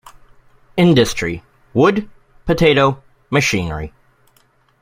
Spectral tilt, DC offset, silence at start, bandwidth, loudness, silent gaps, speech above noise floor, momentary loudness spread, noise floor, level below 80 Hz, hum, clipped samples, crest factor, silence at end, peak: -5.5 dB/octave; under 0.1%; 0.75 s; 16 kHz; -16 LUFS; none; 42 dB; 17 LU; -57 dBFS; -40 dBFS; none; under 0.1%; 18 dB; 0.95 s; 0 dBFS